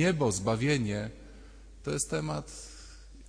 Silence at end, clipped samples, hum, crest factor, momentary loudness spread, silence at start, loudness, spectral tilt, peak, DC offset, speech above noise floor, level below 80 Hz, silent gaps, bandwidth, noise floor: 0 s; under 0.1%; none; 16 dB; 22 LU; 0 s; -31 LUFS; -5 dB/octave; -16 dBFS; under 0.1%; 20 dB; -50 dBFS; none; 10.5 kHz; -50 dBFS